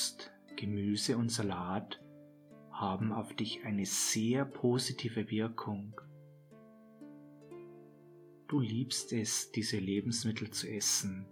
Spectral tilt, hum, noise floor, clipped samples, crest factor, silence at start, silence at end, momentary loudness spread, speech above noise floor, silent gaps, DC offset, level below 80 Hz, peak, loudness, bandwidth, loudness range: -4 dB/octave; none; -58 dBFS; under 0.1%; 18 dB; 0 s; 0 s; 21 LU; 23 dB; none; under 0.1%; -78 dBFS; -20 dBFS; -35 LUFS; 19 kHz; 8 LU